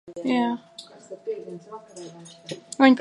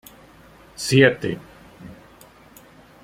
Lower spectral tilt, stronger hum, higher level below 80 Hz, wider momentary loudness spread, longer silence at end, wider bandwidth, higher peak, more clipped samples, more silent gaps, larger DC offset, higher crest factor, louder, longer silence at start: about the same, -4.5 dB/octave vs -5 dB/octave; neither; second, -76 dBFS vs -56 dBFS; second, 22 LU vs 27 LU; second, 0 s vs 1.1 s; second, 11 kHz vs 16 kHz; about the same, -4 dBFS vs -2 dBFS; neither; neither; neither; about the same, 22 dB vs 24 dB; second, -25 LUFS vs -19 LUFS; second, 0.05 s vs 0.8 s